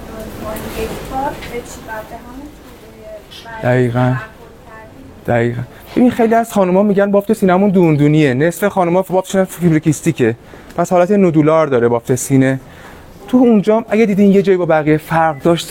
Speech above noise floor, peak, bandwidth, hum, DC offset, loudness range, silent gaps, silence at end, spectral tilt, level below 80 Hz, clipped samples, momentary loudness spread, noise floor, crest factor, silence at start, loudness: 23 dB; -2 dBFS; 17 kHz; none; under 0.1%; 8 LU; none; 0 s; -7 dB/octave; -42 dBFS; under 0.1%; 17 LU; -36 dBFS; 12 dB; 0 s; -13 LUFS